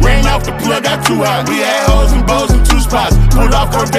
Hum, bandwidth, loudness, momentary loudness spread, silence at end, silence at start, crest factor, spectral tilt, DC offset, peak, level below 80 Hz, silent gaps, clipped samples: none; 15.5 kHz; -12 LUFS; 3 LU; 0 s; 0 s; 10 dB; -4.5 dB/octave; under 0.1%; 0 dBFS; -12 dBFS; none; under 0.1%